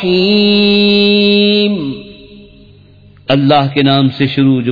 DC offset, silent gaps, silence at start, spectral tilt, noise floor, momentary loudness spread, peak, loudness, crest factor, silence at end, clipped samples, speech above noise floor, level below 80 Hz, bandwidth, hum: under 0.1%; none; 0 s; -8 dB/octave; -41 dBFS; 7 LU; 0 dBFS; -10 LUFS; 12 dB; 0 s; under 0.1%; 31 dB; -46 dBFS; 5 kHz; none